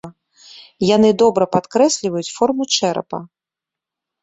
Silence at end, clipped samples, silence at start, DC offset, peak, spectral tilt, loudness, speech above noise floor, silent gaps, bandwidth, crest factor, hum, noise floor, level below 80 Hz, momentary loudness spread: 0.95 s; under 0.1%; 0.05 s; under 0.1%; -2 dBFS; -4.5 dB/octave; -16 LUFS; 70 dB; none; 8.4 kHz; 16 dB; none; -87 dBFS; -58 dBFS; 11 LU